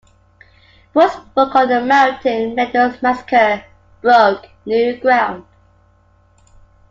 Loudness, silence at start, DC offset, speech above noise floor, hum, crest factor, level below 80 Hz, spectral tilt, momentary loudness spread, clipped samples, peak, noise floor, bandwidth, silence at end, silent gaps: -15 LUFS; 0.95 s; under 0.1%; 39 dB; none; 16 dB; -54 dBFS; -5 dB/octave; 8 LU; under 0.1%; 0 dBFS; -53 dBFS; 7.6 kHz; 1.5 s; none